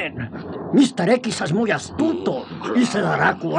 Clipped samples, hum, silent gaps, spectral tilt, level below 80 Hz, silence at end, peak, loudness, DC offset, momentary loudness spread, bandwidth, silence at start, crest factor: under 0.1%; none; none; -5.5 dB/octave; -60 dBFS; 0 s; -2 dBFS; -20 LUFS; under 0.1%; 10 LU; 10.5 kHz; 0 s; 18 dB